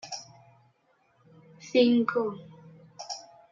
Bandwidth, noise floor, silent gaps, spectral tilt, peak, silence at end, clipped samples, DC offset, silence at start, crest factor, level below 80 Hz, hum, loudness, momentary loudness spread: 7.4 kHz; -68 dBFS; none; -4.5 dB/octave; -10 dBFS; 0.3 s; under 0.1%; under 0.1%; 0.05 s; 20 dB; -78 dBFS; none; -28 LUFS; 23 LU